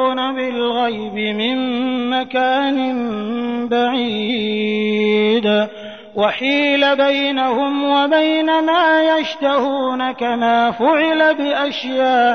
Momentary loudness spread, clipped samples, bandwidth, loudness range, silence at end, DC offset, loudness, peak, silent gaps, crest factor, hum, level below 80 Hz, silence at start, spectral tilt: 6 LU; under 0.1%; 6.6 kHz; 4 LU; 0 s; 0.3%; -17 LUFS; -4 dBFS; none; 12 dB; none; -64 dBFS; 0 s; -5.5 dB/octave